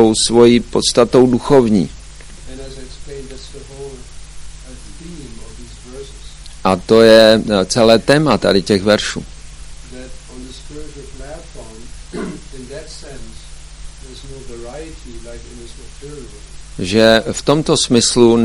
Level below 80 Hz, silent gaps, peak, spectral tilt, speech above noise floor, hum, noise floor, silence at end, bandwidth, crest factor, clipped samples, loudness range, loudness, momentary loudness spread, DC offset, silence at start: -36 dBFS; none; 0 dBFS; -4.5 dB/octave; 23 dB; none; -34 dBFS; 0 s; 15 kHz; 16 dB; 0.4%; 22 LU; -12 LUFS; 25 LU; under 0.1%; 0 s